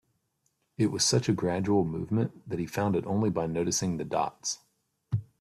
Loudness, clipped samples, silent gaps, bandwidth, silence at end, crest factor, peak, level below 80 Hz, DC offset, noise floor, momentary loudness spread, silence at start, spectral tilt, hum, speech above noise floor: -29 LUFS; under 0.1%; none; 15 kHz; 0.15 s; 18 dB; -12 dBFS; -60 dBFS; under 0.1%; -76 dBFS; 10 LU; 0.8 s; -5 dB/octave; none; 48 dB